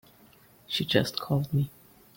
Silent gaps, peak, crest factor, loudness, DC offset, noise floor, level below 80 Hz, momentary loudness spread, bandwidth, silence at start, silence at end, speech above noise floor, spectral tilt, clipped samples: none; -8 dBFS; 22 dB; -28 LUFS; under 0.1%; -57 dBFS; -60 dBFS; 7 LU; 17 kHz; 0.7 s; 0.5 s; 30 dB; -5.5 dB/octave; under 0.1%